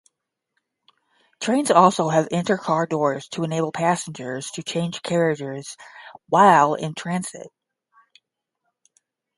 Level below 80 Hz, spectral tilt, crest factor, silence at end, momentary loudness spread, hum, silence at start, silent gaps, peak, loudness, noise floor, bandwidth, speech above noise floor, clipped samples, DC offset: -68 dBFS; -5 dB/octave; 22 dB; 1.9 s; 16 LU; none; 1.4 s; none; 0 dBFS; -21 LUFS; -78 dBFS; 11.5 kHz; 57 dB; under 0.1%; under 0.1%